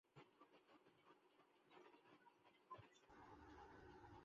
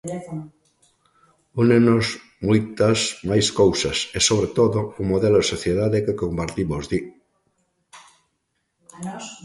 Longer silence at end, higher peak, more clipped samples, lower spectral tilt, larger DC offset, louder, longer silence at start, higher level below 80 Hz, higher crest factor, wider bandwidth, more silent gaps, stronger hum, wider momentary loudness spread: about the same, 0 s vs 0.1 s; second, -48 dBFS vs -4 dBFS; neither; about the same, -4 dB/octave vs -5 dB/octave; neither; second, -66 LUFS vs -20 LUFS; about the same, 0.05 s vs 0.05 s; second, -82 dBFS vs -46 dBFS; about the same, 18 dB vs 18 dB; second, 7.2 kHz vs 11.5 kHz; neither; neither; second, 5 LU vs 15 LU